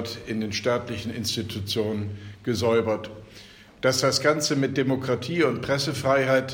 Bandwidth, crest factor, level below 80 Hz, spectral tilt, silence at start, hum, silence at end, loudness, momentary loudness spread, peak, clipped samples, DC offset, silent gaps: 16.5 kHz; 18 dB; -56 dBFS; -4.5 dB/octave; 0 s; none; 0 s; -25 LUFS; 11 LU; -6 dBFS; under 0.1%; under 0.1%; none